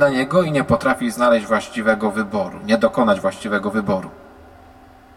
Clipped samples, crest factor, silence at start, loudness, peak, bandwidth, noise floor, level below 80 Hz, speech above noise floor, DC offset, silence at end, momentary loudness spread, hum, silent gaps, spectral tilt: under 0.1%; 18 dB; 0 s; -19 LUFS; -2 dBFS; 15 kHz; -45 dBFS; -50 dBFS; 27 dB; under 0.1%; 0.9 s; 7 LU; none; none; -6 dB/octave